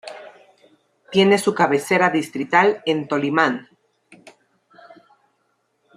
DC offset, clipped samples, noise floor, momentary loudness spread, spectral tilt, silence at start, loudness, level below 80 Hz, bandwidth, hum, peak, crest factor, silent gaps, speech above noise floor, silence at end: under 0.1%; under 0.1%; -68 dBFS; 8 LU; -5 dB/octave; 0.05 s; -18 LUFS; -68 dBFS; 14.5 kHz; none; -2 dBFS; 20 dB; none; 50 dB; 2.35 s